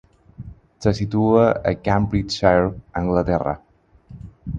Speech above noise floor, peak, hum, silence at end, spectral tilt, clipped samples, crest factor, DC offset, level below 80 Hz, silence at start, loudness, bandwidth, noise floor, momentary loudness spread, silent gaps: 27 dB; 0 dBFS; none; 0 s; -7 dB/octave; under 0.1%; 20 dB; under 0.1%; -38 dBFS; 0.4 s; -20 LUFS; 9 kHz; -45 dBFS; 22 LU; none